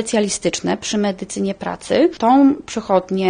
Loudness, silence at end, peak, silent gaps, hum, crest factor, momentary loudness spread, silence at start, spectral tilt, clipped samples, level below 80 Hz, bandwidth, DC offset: -18 LUFS; 0 s; -2 dBFS; none; none; 16 dB; 10 LU; 0 s; -4.5 dB/octave; under 0.1%; -52 dBFS; 10 kHz; under 0.1%